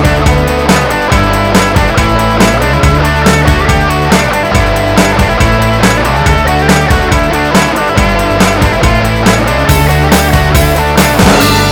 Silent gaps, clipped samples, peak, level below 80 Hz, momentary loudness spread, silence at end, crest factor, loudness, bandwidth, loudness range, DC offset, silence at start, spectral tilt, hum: none; 0.9%; 0 dBFS; -16 dBFS; 2 LU; 0 s; 8 dB; -8 LUFS; over 20 kHz; 1 LU; 0.3%; 0 s; -5 dB/octave; none